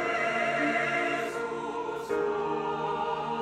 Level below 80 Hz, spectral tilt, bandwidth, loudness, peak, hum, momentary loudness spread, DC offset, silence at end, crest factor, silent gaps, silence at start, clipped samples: -64 dBFS; -4.5 dB/octave; 14.5 kHz; -29 LUFS; -16 dBFS; none; 7 LU; under 0.1%; 0 s; 14 dB; none; 0 s; under 0.1%